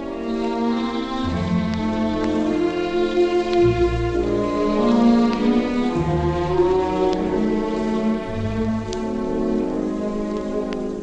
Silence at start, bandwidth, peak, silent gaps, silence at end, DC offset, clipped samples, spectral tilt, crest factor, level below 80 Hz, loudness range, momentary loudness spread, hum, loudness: 0 s; 8.6 kHz; -4 dBFS; none; 0 s; under 0.1%; under 0.1%; -7.5 dB/octave; 16 dB; -36 dBFS; 4 LU; 7 LU; none; -21 LUFS